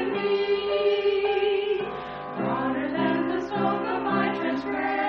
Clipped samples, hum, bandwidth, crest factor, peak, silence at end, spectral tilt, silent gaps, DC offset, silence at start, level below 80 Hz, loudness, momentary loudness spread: under 0.1%; none; 6.2 kHz; 12 dB; -12 dBFS; 0 s; -3.5 dB/octave; none; under 0.1%; 0 s; -58 dBFS; -26 LUFS; 5 LU